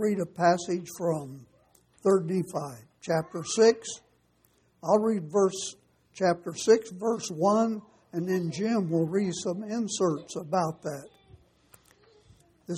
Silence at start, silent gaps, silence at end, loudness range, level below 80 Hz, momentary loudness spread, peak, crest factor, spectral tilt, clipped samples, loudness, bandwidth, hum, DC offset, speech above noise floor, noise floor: 0 s; none; 0 s; 3 LU; -70 dBFS; 14 LU; -8 dBFS; 20 dB; -5.5 dB/octave; under 0.1%; -28 LUFS; 15.5 kHz; none; under 0.1%; 39 dB; -67 dBFS